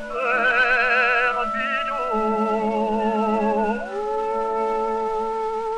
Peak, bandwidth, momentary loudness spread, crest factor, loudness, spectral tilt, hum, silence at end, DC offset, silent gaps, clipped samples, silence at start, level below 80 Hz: -8 dBFS; 10.5 kHz; 8 LU; 14 dB; -21 LUFS; -5.5 dB/octave; none; 0 s; under 0.1%; none; under 0.1%; 0 s; -46 dBFS